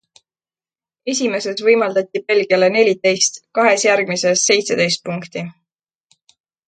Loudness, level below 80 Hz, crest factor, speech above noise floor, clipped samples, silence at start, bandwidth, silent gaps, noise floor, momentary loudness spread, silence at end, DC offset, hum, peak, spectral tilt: -16 LUFS; -68 dBFS; 18 dB; over 74 dB; under 0.1%; 1.05 s; 9.4 kHz; none; under -90 dBFS; 12 LU; 1.15 s; under 0.1%; none; 0 dBFS; -2.5 dB/octave